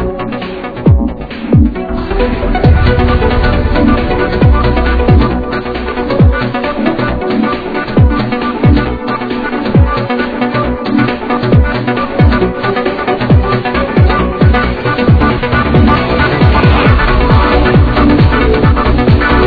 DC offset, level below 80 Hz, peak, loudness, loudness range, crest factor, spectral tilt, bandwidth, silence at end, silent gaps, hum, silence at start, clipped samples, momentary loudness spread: under 0.1%; -16 dBFS; 0 dBFS; -11 LUFS; 4 LU; 10 dB; -9.5 dB/octave; 5 kHz; 0 s; none; none; 0 s; 0.6%; 7 LU